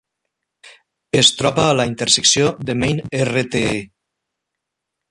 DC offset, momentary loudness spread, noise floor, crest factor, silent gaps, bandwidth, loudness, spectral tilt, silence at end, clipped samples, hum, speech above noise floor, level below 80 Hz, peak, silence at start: under 0.1%; 8 LU; -80 dBFS; 20 dB; none; 11.5 kHz; -16 LUFS; -3 dB/octave; 1.25 s; under 0.1%; none; 63 dB; -46 dBFS; 0 dBFS; 0.65 s